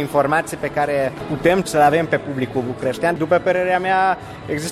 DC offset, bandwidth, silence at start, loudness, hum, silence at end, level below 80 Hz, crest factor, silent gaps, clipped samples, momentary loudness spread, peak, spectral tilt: under 0.1%; 15 kHz; 0 s; -19 LUFS; none; 0 s; -48 dBFS; 16 dB; none; under 0.1%; 8 LU; -2 dBFS; -5.5 dB/octave